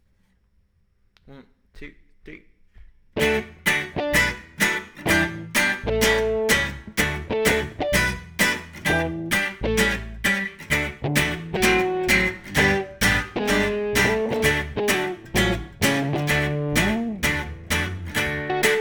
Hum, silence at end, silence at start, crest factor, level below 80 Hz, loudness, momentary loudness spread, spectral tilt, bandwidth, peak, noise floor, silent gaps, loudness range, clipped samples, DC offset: none; 0 s; 1.3 s; 18 dB; -38 dBFS; -22 LUFS; 5 LU; -3.5 dB/octave; over 20 kHz; -4 dBFS; -63 dBFS; none; 4 LU; under 0.1%; under 0.1%